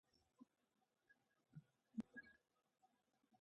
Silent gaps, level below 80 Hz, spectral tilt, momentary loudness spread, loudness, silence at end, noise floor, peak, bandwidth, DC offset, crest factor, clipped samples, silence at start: none; under -90 dBFS; -6.5 dB/octave; 13 LU; -58 LUFS; 0.05 s; -88 dBFS; -38 dBFS; 8 kHz; under 0.1%; 26 dB; under 0.1%; 0.4 s